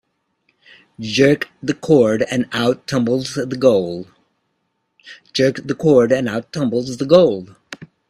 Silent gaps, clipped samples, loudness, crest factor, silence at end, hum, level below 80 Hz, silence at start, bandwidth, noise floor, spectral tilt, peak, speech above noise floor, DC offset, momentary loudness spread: none; under 0.1%; -17 LUFS; 18 dB; 0.25 s; none; -56 dBFS; 1 s; 13.5 kHz; -70 dBFS; -6 dB/octave; 0 dBFS; 54 dB; under 0.1%; 14 LU